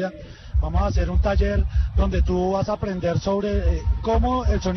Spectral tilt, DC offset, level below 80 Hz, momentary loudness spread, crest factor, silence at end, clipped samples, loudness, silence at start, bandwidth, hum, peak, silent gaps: -7.5 dB/octave; under 0.1%; -24 dBFS; 4 LU; 12 dB; 0 s; under 0.1%; -23 LUFS; 0 s; 6.4 kHz; none; -10 dBFS; none